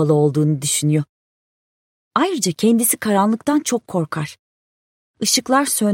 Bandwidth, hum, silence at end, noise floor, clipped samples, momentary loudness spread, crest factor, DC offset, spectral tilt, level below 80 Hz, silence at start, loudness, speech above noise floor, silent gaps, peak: 16.5 kHz; none; 0 s; under -90 dBFS; under 0.1%; 8 LU; 18 dB; under 0.1%; -4.5 dB/octave; -64 dBFS; 0 s; -18 LUFS; over 73 dB; 1.09-2.11 s, 4.39-5.14 s; -2 dBFS